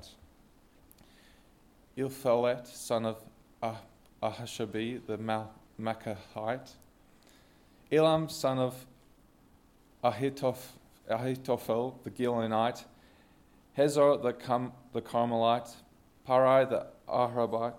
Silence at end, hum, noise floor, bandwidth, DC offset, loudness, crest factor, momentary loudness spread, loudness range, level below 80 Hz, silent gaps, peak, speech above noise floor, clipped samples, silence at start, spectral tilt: 0 s; none; -62 dBFS; 17 kHz; under 0.1%; -31 LUFS; 20 dB; 14 LU; 8 LU; -66 dBFS; none; -12 dBFS; 32 dB; under 0.1%; 0.05 s; -6 dB/octave